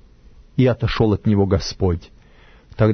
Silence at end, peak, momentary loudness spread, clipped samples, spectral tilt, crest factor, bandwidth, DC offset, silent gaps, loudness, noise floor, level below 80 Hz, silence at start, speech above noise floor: 0 s; -2 dBFS; 6 LU; under 0.1%; -7.5 dB/octave; 18 dB; 6.6 kHz; under 0.1%; none; -19 LUFS; -48 dBFS; -36 dBFS; 0.55 s; 30 dB